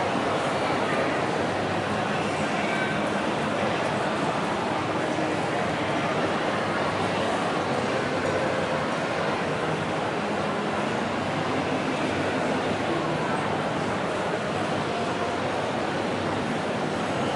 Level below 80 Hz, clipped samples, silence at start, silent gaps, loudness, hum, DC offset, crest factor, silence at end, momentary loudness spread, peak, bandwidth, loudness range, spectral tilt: -58 dBFS; under 0.1%; 0 s; none; -26 LUFS; none; under 0.1%; 14 dB; 0 s; 2 LU; -12 dBFS; 11.5 kHz; 1 LU; -5 dB/octave